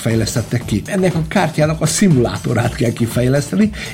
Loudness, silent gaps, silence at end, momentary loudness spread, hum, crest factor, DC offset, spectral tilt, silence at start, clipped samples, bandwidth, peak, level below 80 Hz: -16 LUFS; none; 0 s; 6 LU; none; 12 dB; under 0.1%; -5.5 dB/octave; 0 s; under 0.1%; 16.5 kHz; -4 dBFS; -36 dBFS